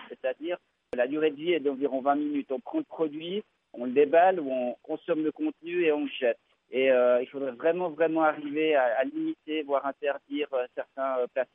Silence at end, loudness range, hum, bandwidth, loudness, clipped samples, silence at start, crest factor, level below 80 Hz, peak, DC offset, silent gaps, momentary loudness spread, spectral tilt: 0.1 s; 3 LU; none; 3.8 kHz; -28 LUFS; under 0.1%; 0 s; 18 dB; -80 dBFS; -10 dBFS; under 0.1%; none; 11 LU; -8 dB/octave